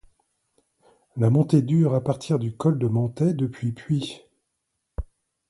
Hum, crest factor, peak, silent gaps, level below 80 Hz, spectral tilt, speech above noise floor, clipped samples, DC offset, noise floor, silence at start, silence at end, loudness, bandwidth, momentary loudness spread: none; 18 dB; -6 dBFS; none; -46 dBFS; -8.5 dB/octave; 56 dB; under 0.1%; under 0.1%; -78 dBFS; 1.15 s; 0.45 s; -23 LUFS; 11.5 kHz; 19 LU